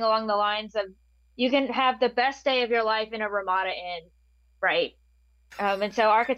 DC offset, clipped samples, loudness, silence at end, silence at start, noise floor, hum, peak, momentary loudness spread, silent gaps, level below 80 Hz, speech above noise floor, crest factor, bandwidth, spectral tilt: under 0.1%; under 0.1%; -25 LUFS; 0 s; 0 s; -62 dBFS; none; -10 dBFS; 10 LU; none; -62 dBFS; 36 dB; 18 dB; 13.5 kHz; -4 dB/octave